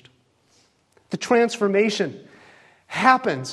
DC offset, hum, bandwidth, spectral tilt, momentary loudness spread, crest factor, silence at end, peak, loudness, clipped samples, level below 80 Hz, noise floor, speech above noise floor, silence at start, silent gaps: under 0.1%; none; 12 kHz; -4.5 dB/octave; 14 LU; 22 dB; 0 s; -2 dBFS; -21 LUFS; under 0.1%; -70 dBFS; -61 dBFS; 41 dB; 1.1 s; none